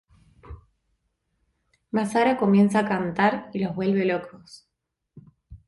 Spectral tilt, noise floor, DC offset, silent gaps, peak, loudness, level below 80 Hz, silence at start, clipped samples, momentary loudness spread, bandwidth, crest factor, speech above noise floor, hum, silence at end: -7 dB/octave; -74 dBFS; under 0.1%; none; -8 dBFS; -23 LUFS; -56 dBFS; 0.45 s; under 0.1%; 10 LU; 11.5 kHz; 18 dB; 51 dB; none; 0.1 s